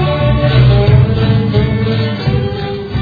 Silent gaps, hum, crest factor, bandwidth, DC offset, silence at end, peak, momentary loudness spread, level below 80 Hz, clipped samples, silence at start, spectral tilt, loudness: none; none; 12 dB; 5 kHz; under 0.1%; 0 s; 0 dBFS; 8 LU; -22 dBFS; under 0.1%; 0 s; -9.5 dB/octave; -12 LUFS